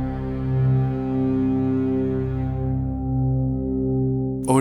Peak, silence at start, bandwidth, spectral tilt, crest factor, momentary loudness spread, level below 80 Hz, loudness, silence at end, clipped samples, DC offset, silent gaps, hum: -6 dBFS; 0 s; 12 kHz; -9 dB/octave; 16 dB; 5 LU; -34 dBFS; -23 LUFS; 0 s; under 0.1%; under 0.1%; none; none